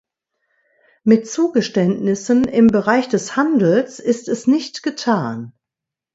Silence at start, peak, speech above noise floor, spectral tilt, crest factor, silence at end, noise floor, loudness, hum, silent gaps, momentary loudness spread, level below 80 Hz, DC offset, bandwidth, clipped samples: 1.05 s; 0 dBFS; 69 dB; -6 dB/octave; 18 dB; 0.65 s; -85 dBFS; -17 LUFS; none; none; 9 LU; -56 dBFS; under 0.1%; 8 kHz; under 0.1%